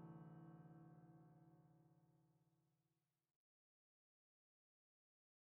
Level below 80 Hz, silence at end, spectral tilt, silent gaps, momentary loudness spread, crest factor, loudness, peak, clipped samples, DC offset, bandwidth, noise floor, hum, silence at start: under -90 dBFS; 2.55 s; -8 dB/octave; none; 7 LU; 20 dB; -64 LUFS; -48 dBFS; under 0.1%; under 0.1%; 2.9 kHz; under -90 dBFS; none; 0 s